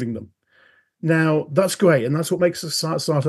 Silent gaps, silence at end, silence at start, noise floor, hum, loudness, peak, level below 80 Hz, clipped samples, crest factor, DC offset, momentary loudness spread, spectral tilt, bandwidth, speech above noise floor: none; 0 s; 0 s; -57 dBFS; none; -20 LUFS; -4 dBFS; -66 dBFS; under 0.1%; 18 dB; under 0.1%; 10 LU; -5.5 dB/octave; 12.5 kHz; 37 dB